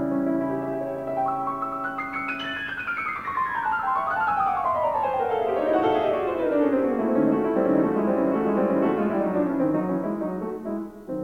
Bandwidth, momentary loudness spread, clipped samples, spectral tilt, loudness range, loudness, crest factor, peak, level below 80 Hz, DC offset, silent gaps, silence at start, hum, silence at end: 15.5 kHz; 7 LU; under 0.1%; -8 dB/octave; 5 LU; -25 LUFS; 16 dB; -8 dBFS; -56 dBFS; under 0.1%; none; 0 s; none; 0 s